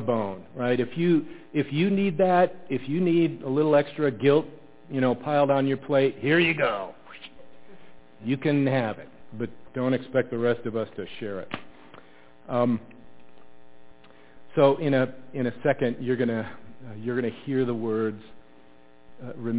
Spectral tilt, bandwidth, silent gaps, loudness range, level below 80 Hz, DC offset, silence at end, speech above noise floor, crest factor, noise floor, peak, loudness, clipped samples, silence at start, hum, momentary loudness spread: -11 dB/octave; 4 kHz; none; 7 LU; -64 dBFS; 0.6%; 0 s; 31 dB; 18 dB; -56 dBFS; -8 dBFS; -25 LUFS; under 0.1%; 0 s; none; 16 LU